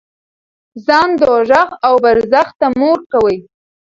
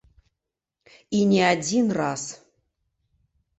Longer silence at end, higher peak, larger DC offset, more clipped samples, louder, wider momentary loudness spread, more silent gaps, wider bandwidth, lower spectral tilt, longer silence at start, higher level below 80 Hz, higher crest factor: second, 0.6 s vs 1.25 s; first, 0 dBFS vs -6 dBFS; neither; neither; first, -12 LUFS vs -22 LUFS; second, 5 LU vs 12 LU; first, 2.55-2.59 s, 3.06-3.10 s vs none; second, 7.6 kHz vs 8.4 kHz; about the same, -5.5 dB/octave vs -4.5 dB/octave; second, 0.75 s vs 1.1 s; first, -48 dBFS vs -64 dBFS; second, 14 dB vs 20 dB